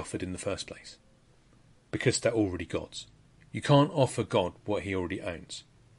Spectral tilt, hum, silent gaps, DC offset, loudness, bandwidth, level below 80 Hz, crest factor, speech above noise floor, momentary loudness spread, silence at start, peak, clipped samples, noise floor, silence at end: -5.5 dB/octave; none; none; under 0.1%; -30 LUFS; 11.5 kHz; -58 dBFS; 22 dB; 31 dB; 19 LU; 0 s; -10 dBFS; under 0.1%; -61 dBFS; 0.4 s